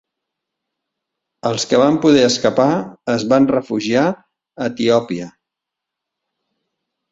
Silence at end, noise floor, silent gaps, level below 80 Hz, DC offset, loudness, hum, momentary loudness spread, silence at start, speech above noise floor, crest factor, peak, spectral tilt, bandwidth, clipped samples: 1.8 s; -82 dBFS; none; -58 dBFS; under 0.1%; -16 LUFS; none; 13 LU; 1.45 s; 67 dB; 18 dB; -2 dBFS; -5 dB/octave; 8 kHz; under 0.1%